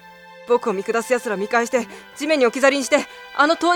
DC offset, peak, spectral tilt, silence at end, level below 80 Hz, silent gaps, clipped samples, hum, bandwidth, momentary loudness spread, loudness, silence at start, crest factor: under 0.1%; -2 dBFS; -3 dB/octave; 0 s; -66 dBFS; none; under 0.1%; none; 18.5 kHz; 8 LU; -20 LUFS; 0.25 s; 18 dB